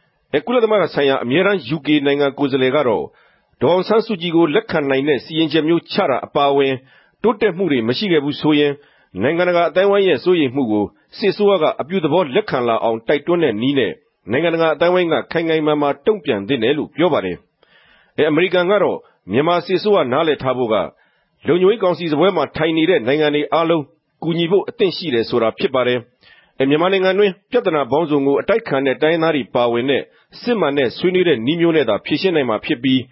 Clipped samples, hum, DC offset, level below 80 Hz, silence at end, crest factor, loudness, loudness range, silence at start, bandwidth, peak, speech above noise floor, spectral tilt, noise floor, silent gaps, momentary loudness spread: under 0.1%; none; under 0.1%; -56 dBFS; 0.05 s; 14 dB; -17 LUFS; 1 LU; 0.35 s; 5.8 kHz; -2 dBFS; 36 dB; -10.5 dB/octave; -53 dBFS; none; 6 LU